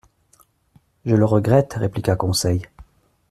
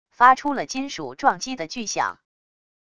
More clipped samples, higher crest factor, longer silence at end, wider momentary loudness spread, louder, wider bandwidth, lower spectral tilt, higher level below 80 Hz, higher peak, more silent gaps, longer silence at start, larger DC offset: neither; about the same, 18 dB vs 22 dB; second, 0.5 s vs 0.8 s; second, 8 LU vs 13 LU; first, -19 LUFS vs -22 LUFS; first, 14 kHz vs 11 kHz; first, -6 dB/octave vs -2.5 dB/octave; first, -48 dBFS vs -62 dBFS; about the same, -2 dBFS vs -2 dBFS; neither; first, 1.05 s vs 0.2 s; second, under 0.1% vs 0.4%